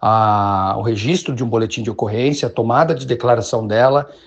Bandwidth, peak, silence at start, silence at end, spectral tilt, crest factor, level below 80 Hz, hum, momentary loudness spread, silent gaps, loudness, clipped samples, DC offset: 8.6 kHz; 0 dBFS; 0 s; 0.1 s; -6 dB/octave; 16 dB; -52 dBFS; none; 5 LU; none; -17 LUFS; under 0.1%; under 0.1%